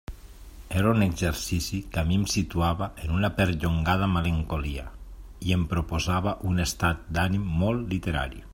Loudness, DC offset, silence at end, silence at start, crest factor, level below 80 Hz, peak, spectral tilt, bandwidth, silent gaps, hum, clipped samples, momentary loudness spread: -27 LUFS; under 0.1%; 0 s; 0.1 s; 18 dB; -38 dBFS; -8 dBFS; -5.5 dB/octave; 16.5 kHz; none; none; under 0.1%; 7 LU